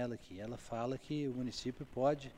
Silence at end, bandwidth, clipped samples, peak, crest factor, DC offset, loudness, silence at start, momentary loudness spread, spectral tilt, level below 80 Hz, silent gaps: 0 s; 15.5 kHz; under 0.1%; -20 dBFS; 18 dB; under 0.1%; -40 LUFS; 0 s; 11 LU; -6 dB/octave; -62 dBFS; none